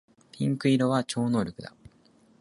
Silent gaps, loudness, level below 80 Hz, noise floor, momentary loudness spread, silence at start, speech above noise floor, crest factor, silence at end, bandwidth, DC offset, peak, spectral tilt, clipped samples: none; -27 LUFS; -62 dBFS; -60 dBFS; 16 LU; 0.35 s; 35 dB; 18 dB; 0.75 s; 11.5 kHz; under 0.1%; -10 dBFS; -6.5 dB/octave; under 0.1%